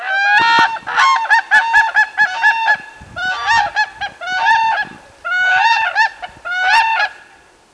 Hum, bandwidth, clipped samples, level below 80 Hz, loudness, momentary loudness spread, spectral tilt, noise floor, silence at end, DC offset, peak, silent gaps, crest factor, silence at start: none; 11 kHz; under 0.1%; -52 dBFS; -13 LUFS; 10 LU; -0.5 dB/octave; -46 dBFS; 0.6 s; under 0.1%; -2 dBFS; none; 12 dB; 0 s